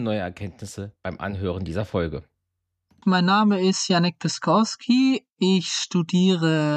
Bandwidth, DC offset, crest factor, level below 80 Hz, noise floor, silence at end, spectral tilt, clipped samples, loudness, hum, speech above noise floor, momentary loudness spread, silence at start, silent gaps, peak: 9.6 kHz; under 0.1%; 16 dB; -52 dBFS; -79 dBFS; 0 s; -5 dB/octave; under 0.1%; -22 LUFS; none; 57 dB; 15 LU; 0 s; 5.32-5.36 s; -8 dBFS